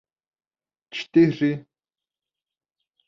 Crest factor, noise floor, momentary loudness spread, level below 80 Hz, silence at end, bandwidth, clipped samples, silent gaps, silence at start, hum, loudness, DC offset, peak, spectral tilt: 20 dB; under -90 dBFS; 16 LU; -66 dBFS; 1.5 s; 7 kHz; under 0.1%; none; 0.95 s; none; -21 LUFS; under 0.1%; -6 dBFS; -7.5 dB/octave